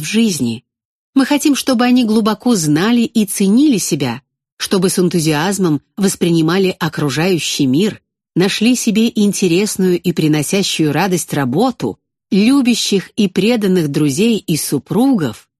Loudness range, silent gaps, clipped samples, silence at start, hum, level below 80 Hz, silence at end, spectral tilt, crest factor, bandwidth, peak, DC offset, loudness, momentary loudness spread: 2 LU; 0.85-1.13 s, 4.52-4.57 s; under 0.1%; 0 s; none; -54 dBFS; 0.2 s; -5 dB/octave; 14 dB; 13 kHz; 0 dBFS; under 0.1%; -14 LUFS; 6 LU